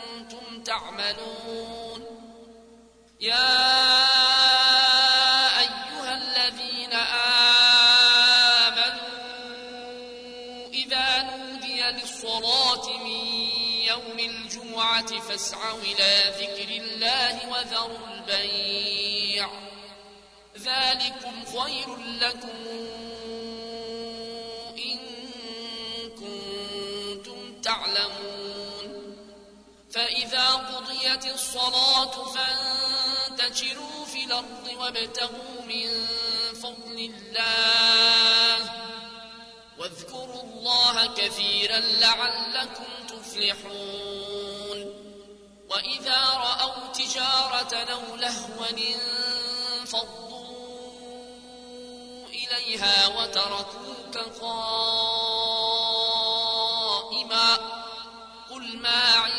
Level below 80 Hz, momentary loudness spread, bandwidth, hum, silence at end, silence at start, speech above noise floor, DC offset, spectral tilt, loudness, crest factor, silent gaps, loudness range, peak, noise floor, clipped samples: -62 dBFS; 21 LU; 11 kHz; none; 0 s; 0 s; 28 dB; under 0.1%; 0 dB/octave; -22 LUFS; 18 dB; none; 13 LU; -8 dBFS; -53 dBFS; under 0.1%